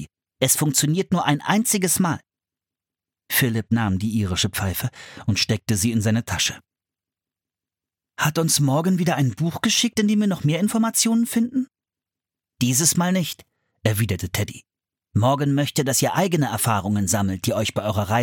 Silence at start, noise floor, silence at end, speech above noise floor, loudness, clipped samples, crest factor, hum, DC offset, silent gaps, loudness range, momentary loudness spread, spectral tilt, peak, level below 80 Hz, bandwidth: 0 s; -90 dBFS; 0 s; 69 dB; -21 LUFS; under 0.1%; 20 dB; none; under 0.1%; none; 3 LU; 7 LU; -4 dB/octave; -2 dBFS; -52 dBFS; 17.5 kHz